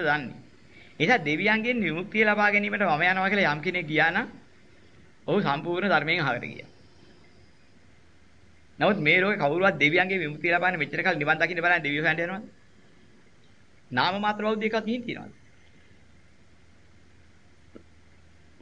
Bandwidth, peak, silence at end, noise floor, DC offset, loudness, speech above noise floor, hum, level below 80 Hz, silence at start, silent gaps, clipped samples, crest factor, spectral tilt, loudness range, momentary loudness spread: 7.8 kHz; -6 dBFS; 3.3 s; -59 dBFS; 0.2%; -24 LUFS; 34 dB; none; -64 dBFS; 0 s; none; under 0.1%; 20 dB; -6 dB/octave; 7 LU; 10 LU